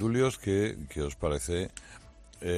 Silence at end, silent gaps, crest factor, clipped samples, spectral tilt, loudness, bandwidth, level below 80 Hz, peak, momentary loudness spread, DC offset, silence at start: 0 s; none; 16 dB; under 0.1%; -5.5 dB/octave; -31 LUFS; 14 kHz; -46 dBFS; -14 dBFS; 19 LU; under 0.1%; 0 s